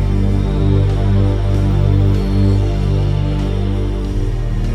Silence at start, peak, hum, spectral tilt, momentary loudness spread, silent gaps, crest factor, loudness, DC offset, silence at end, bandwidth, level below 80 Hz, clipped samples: 0 s; -4 dBFS; 50 Hz at -20 dBFS; -8.5 dB/octave; 6 LU; none; 10 dB; -16 LUFS; under 0.1%; 0 s; 8.4 kHz; -18 dBFS; under 0.1%